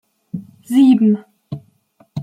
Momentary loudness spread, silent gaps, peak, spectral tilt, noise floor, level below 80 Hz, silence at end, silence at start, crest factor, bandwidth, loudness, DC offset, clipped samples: 22 LU; none; -4 dBFS; -7.5 dB/octave; -55 dBFS; -64 dBFS; 0 s; 0.35 s; 14 dB; 13 kHz; -14 LUFS; under 0.1%; under 0.1%